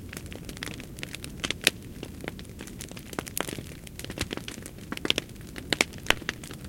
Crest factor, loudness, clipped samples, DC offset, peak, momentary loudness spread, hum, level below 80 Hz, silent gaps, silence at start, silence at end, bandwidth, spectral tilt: 34 dB; -32 LUFS; under 0.1%; under 0.1%; 0 dBFS; 15 LU; none; -48 dBFS; none; 0 s; 0 s; 17 kHz; -2.5 dB/octave